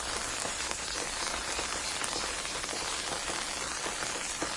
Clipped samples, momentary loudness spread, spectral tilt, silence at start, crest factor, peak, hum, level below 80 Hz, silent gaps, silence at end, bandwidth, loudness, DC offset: under 0.1%; 1 LU; -0.5 dB/octave; 0 s; 26 dB; -10 dBFS; none; -52 dBFS; none; 0 s; 11.5 kHz; -32 LUFS; under 0.1%